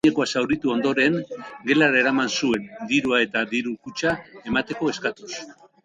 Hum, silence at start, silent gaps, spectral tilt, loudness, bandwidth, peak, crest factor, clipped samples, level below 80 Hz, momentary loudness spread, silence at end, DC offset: none; 0.05 s; none; -4 dB/octave; -22 LUFS; 9.6 kHz; -4 dBFS; 18 dB; under 0.1%; -58 dBFS; 12 LU; 0.3 s; under 0.1%